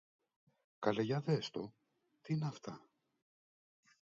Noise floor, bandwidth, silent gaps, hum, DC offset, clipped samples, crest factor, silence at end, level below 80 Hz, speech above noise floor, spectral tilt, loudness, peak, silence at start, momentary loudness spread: under -90 dBFS; 7.4 kHz; none; none; under 0.1%; under 0.1%; 24 dB; 1.3 s; -80 dBFS; over 52 dB; -6 dB/octave; -39 LUFS; -18 dBFS; 0.8 s; 16 LU